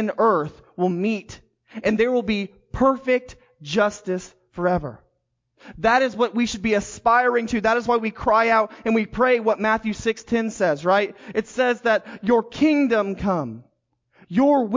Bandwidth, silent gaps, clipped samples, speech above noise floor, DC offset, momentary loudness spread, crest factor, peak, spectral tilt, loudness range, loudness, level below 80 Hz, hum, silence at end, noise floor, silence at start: 7.6 kHz; none; under 0.1%; 51 dB; under 0.1%; 9 LU; 16 dB; -6 dBFS; -5.5 dB/octave; 4 LU; -21 LUFS; -48 dBFS; none; 0 s; -72 dBFS; 0 s